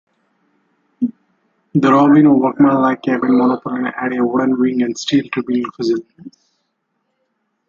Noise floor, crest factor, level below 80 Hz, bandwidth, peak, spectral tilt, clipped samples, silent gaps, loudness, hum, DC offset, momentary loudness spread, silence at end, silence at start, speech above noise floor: -70 dBFS; 14 dB; -60 dBFS; 7.4 kHz; -2 dBFS; -6.5 dB/octave; under 0.1%; none; -15 LUFS; none; under 0.1%; 12 LU; 1.4 s; 1 s; 56 dB